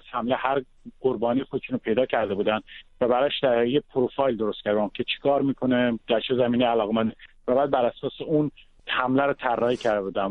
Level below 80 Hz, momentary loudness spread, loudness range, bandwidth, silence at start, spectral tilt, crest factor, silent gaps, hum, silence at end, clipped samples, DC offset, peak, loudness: -56 dBFS; 6 LU; 1 LU; 8 kHz; 0.05 s; -7 dB/octave; 18 dB; none; none; 0 s; under 0.1%; under 0.1%; -8 dBFS; -25 LUFS